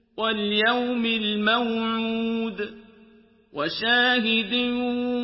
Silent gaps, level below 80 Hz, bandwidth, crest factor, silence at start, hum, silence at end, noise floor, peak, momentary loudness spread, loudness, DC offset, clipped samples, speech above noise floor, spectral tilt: none; -62 dBFS; 5.8 kHz; 16 dB; 0.15 s; none; 0 s; -55 dBFS; -8 dBFS; 10 LU; -23 LUFS; under 0.1%; under 0.1%; 31 dB; -8 dB/octave